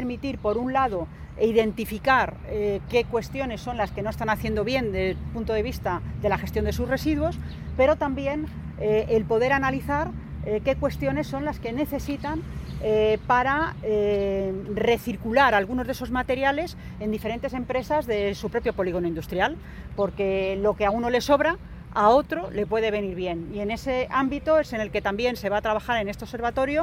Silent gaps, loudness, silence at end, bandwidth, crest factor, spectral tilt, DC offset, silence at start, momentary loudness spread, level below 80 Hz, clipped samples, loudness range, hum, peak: none; -25 LUFS; 0 s; 16.5 kHz; 18 dB; -6 dB/octave; under 0.1%; 0 s; 9 LU; -40 dBFS; under 0.1%; 3 LU; none; -6 dBFS